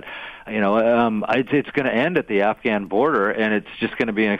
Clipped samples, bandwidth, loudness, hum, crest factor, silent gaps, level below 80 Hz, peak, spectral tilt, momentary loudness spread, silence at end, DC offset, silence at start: under 0.1%; 6.8 kHz; -20 LUFS; none; 14 dB; none; -56 dBFS; -6 dBFS; -7.5 dB/octave; 6 LU; 0 s; under 0.1%; 0 s